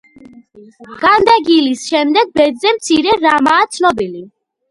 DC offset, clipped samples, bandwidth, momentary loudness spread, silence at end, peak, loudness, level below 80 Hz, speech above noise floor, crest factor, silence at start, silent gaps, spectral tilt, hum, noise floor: under 0.1%; under 0.1%; 11.5 kHz; 6 LU; 0.45 s; 0 dBFS; -12 LUFS; -50 dBFS; 28 dB; 14 dB; 0.6 s; none; -3 dB/octave; none; -41 dBFS